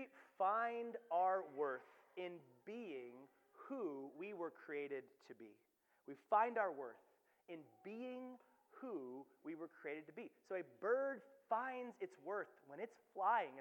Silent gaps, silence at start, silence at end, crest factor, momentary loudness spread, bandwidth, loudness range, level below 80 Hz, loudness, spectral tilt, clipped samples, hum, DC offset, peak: none; 0 s; 0 s; 22 dB; 19 LU; 19 kHz; 8 LU; under -90 dBFS; -45 LUFS; -6 dB/octave; under 0.1%; none; under 0.1%; -24 dBFS